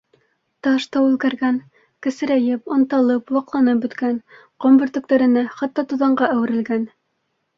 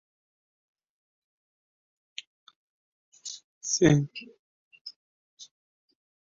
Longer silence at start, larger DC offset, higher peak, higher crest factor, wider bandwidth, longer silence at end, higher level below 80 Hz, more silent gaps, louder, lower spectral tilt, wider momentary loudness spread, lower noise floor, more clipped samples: second, 0.65 s vs 3.25 s; neither; first, -2 dBFS vs -8 dBFS; second, 16 dB vs 26 dB; about the same, 7.4 kHz vs 7.4 kHz; second, 0.7 s vs 0.9 s; about the same, -66 dBFS vs -62 dBFS; second, none vs 3.44-3.61 s, 4.39-4.71 s, 4.81-4.85 s, 4.96-5.37 s; first, -19 LUFS vs -26 LUFS; about the same, -6 dB/octave vs -6 dB/octave; second, 9 LU vs 28 LU; second, -71 dBFS vs under -90 dBFS; neither